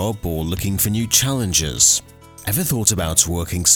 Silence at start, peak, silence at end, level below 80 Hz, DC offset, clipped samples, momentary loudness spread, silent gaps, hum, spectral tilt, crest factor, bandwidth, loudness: 0 s; 0 dBFS; 0 s; -36 dBFS; under 0.1%; under 0.1%; 10 LU; none; none; -3 dB/octave; 20 dB; over 20 kHz; -17 LUFS